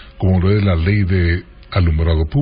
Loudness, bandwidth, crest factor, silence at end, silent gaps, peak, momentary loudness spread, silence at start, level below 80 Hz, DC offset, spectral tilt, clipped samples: -16 LUFS; 5 kHz; 12 dB; 0 s; none; -4 dBFS; 5 LU; 0 s; -22 dBFS; under 0.1%; -13 dB/octave; under 0.1%